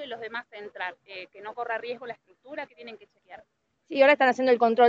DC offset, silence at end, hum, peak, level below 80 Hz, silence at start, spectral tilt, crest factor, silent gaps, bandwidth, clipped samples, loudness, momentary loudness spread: under 0.1%; 0 s; none; -6 dBFS; -80 dBFS; 0 s; -4.5 dB/octave; 20 dB; none; 7.6 kHz; under 0.1%; -25 LUFS; 22 LU